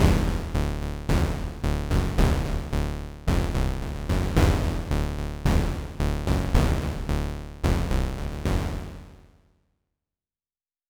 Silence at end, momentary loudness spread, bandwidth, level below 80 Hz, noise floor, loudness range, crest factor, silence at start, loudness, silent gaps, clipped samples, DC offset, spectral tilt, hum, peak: 1.75 s; 8 LU; 20 kHz; -28 dBFS; under -90 dBFS; 5 LU; 18 dB; 0 s; -27 LUFS; none; under 0.1%; under 0.1%; -6.5 dB/octave; none; -8 dBFS